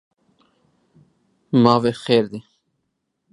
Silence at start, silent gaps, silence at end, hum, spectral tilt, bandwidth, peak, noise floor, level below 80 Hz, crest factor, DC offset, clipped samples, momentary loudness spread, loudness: 1.55 s; none; 0.9 s; none; -7 dB/octave; 11 kHz; 0 dBFS; -75 dBFS; -62 dBFS; 22 dB; under 0.1%; under 0.1%; 14 LU; -18 LUFS